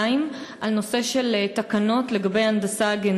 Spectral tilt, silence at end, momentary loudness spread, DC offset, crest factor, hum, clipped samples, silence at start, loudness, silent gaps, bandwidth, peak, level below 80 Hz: -4.5 dB/octave; 0 s; 4 LU; under 0.1%; 12 dB; none; under 0.1%; 0 s; -23 LUFS; none; 13 kHz; -10 dBFS; -66 dBFS